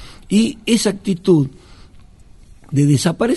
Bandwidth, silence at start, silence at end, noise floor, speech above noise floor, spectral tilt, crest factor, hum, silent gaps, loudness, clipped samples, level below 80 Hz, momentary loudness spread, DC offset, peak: 12 kHz; 0 s; 0 s; -43 dBFS; 27 dB; -6 dB/octave; 16 dB; none; none; -17 LUFS; under 0.1%; -46 dBFS; 5 LU; under 0.1%; -2 dBFS